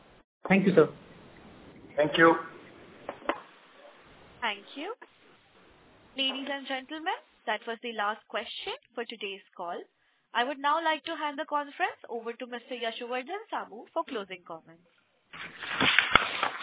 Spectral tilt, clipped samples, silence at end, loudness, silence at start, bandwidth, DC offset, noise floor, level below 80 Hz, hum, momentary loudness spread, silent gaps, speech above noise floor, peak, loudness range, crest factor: -2 dB/octave; under 0.1%; 0 s; -30 LUFS; 0.45 s; 4 kHz; under 0.1%; -59 dBFS; -64 dBFS; none; 19 LU; none; 29 dB; -2 dBFS; 9 LU; 30 dB